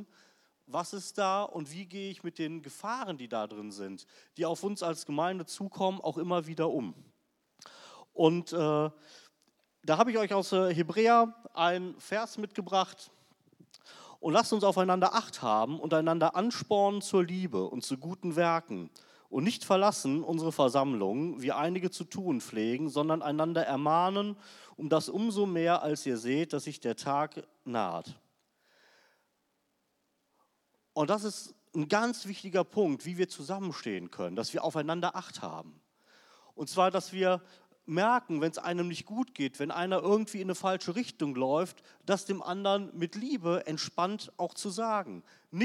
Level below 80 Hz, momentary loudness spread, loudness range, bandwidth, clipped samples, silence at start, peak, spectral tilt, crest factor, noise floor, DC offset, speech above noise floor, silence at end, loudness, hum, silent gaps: -88 dBFS; 13 LU; 8 LU; 15 kHz; under 0.1%; 0 s; -10 dBFS; -5 dB/octave; 22 dB; -78 dBFS; under 0.1%; 47 dB; 0 s; -31 LUFS; none; none